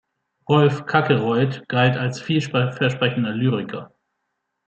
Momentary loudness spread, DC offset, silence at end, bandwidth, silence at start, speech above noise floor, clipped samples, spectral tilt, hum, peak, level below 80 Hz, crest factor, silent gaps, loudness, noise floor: 8 LU; under 0.1%; 0.8 s; 8.2 kHz; 0.5 s; 57 dB; under 0.1%; -7 dB/octave; none; -2 dBFS; -62 dBFS; 20 dB; none; -20 LUFS; -76 dBFS